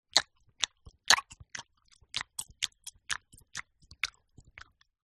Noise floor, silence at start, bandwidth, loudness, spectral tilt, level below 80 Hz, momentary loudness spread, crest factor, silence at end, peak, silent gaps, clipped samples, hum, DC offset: -66 dBFS; 0.15 s; 13 kHz; -31 LUFS; 1.5 dB/octave; -64 dBFS; 26 LU; 32 dB; 1 s; -4 dBFS; none; under 0.1%; none; under 0.1%